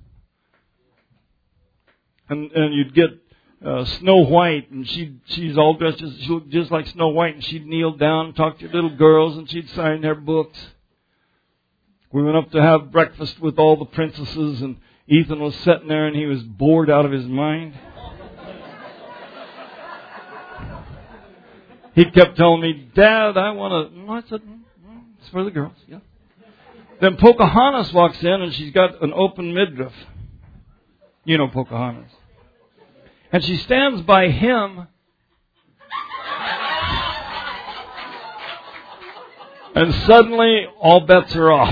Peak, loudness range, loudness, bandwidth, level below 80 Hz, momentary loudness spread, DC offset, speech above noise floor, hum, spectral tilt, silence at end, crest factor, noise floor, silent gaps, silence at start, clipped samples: 0 dBFS; 10 LU; -17 LUFS; 5.4 kHz; -44 dBFS; 24 LU; under 0.1%; 52 dB; none; -8.5 dB/octave; 0 s; 18 dB; -68 dBFS; none; 2.3 s; under 0.1%